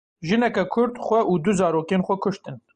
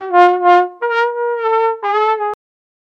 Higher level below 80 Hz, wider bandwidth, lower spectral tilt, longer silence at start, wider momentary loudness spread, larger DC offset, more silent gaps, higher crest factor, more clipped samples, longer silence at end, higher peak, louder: first, -56 dBFS vs -70 dBFS; first, 9.6 kHz vs 7.4 kHz; first, -6.5 dB/octave vs -3 dB/octave; first, 0.2 s vs 0 s; second, 5 LU vs 9 LU; neither; neither; about the same, 14 dB vs 14 dB; neither; second, 0.2 s vs 0.65 s; second, -8 dBFS vs 0 dBFS; second, -22 LUFS vs -14 LUFS